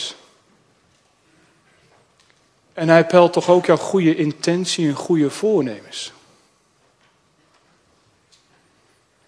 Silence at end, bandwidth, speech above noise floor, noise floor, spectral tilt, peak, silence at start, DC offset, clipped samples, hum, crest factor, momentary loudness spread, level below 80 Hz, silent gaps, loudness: 3.2 s; 11 kHz; 44 dB; -60 dBFS; -5.5 dB/octave; 0 dBFS; 0 s; under 0.1%; under 0.1%; none; 20 dB; 16 LU; -70 dBFS; none; -17 LUFS